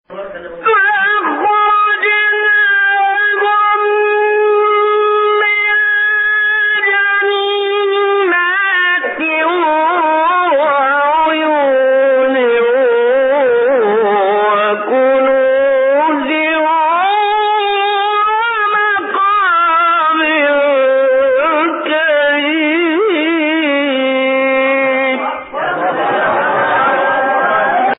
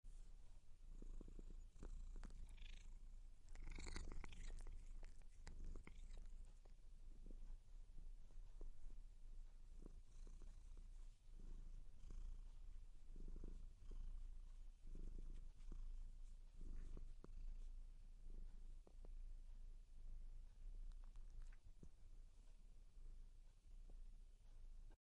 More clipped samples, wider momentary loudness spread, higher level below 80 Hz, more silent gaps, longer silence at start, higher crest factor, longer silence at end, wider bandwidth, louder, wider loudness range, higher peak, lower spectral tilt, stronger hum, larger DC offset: neither; second, 3 LU vs 7 LU; about the same, -58 dBFS vs -56 dBFS; neither; about the same, 0.1 s vs 0.05 s; second, 10 dB vs 18 dB; about the same, 0.05 s vs 0.1 s; second, 4 kHz vs 10.5 kHz; first, -12 LUFS vs -64 LUFS; second, 2 LU vs 5 LU; first, -2 dBFS vs -36 dBFS; first, -8.5 dB/octave vs -5 dB/octave; neither; neither